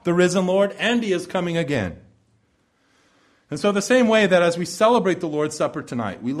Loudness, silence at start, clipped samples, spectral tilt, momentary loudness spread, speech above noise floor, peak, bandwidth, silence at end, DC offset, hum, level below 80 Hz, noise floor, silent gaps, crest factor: -20 LUFS; 0.05 s; under 0.1%; -5 dB/octave; 11 LU; 44 dB; -4 dBFS; 14 kHz; 0 s; under 0.1%; none; -58 dBFS; -64 dBFS; none; 16 dB